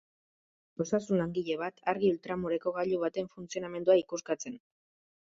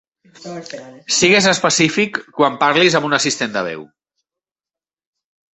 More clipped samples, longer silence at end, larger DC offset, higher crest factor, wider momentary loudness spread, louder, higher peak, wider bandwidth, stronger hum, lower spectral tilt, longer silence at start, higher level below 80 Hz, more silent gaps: neither; second, 0.65 s vs 1.75 s; neither; about the same, 20 dB vs 18 dB; second, 12 LU vs 20 LU; second, -32 LUFS vs -15 LUFS; second, -14 dBFS vs 0 dBFS; about the same, 7.8 kHz vs 8.4 kHz; neither; first, -5.5 dB/octave vs -3 dB/octave; first, 0.8 s vs 0.4 s; second, -70 dBFS vs -58 dBFS; neither